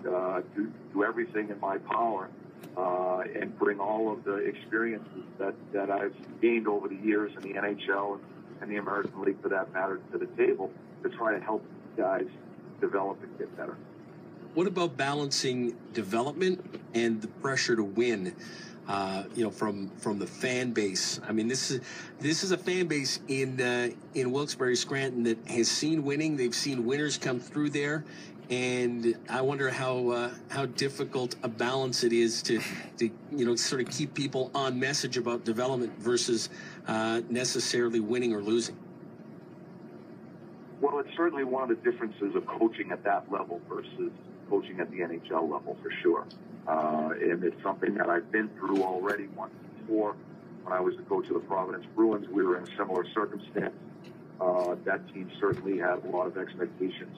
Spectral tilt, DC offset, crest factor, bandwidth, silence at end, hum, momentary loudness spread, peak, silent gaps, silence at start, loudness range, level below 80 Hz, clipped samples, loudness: -4 dB/octave; under 0.1%; 16 dB; 15 kHz; 0 s; none; 12 LU; -14 dBFS; none; 0 s; 3 LU; -80 dBFS; under 0.1%; -31 LUFS